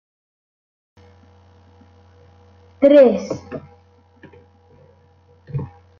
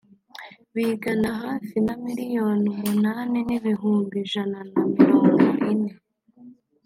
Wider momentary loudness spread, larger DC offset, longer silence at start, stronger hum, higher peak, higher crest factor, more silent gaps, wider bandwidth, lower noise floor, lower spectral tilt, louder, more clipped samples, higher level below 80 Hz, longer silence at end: first, 23 LU vs 12 LU; neither; first, 2.8 s vs 0.35 s; first, 50 Hz at -60 dBFS vs none; about the same, -2 dBFS vs -2 dBFS; about the same, 20 dB vs 20 dB; neither; second, 6.8 kHz vs 16.5 kHz; first, -53 dBFS vs -49 dBFS; about the same, -7.5 dB/octave vs -7 dB/octave; first, -16 LUFS vs -23 LUFS; neither; about the same, -60 dBFS vs -60 dBFS; about the same, 0.35 s vs 0.35 s